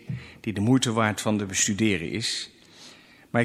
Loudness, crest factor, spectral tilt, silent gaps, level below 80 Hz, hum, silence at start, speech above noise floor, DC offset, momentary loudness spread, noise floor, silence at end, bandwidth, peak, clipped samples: -25 LUFS; 20 dB; -4 dB/octave; none; -60 dBFS; none; 0.05 s; 26 dB; under 0.1%; 11 LU; -51 dBFS; 0 s; 15 kHz; -6 dBFS; under 0.1%